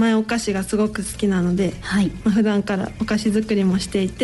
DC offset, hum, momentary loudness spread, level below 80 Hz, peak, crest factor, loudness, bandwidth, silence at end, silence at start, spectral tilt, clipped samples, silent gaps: under 0.1%; none; 4 LU; -42 dBFS; -8 dBFS; 12 dB; -21 LUFS; 12 kHz; 0 s; 0 s; -6 dB/octave; under 0.1%; none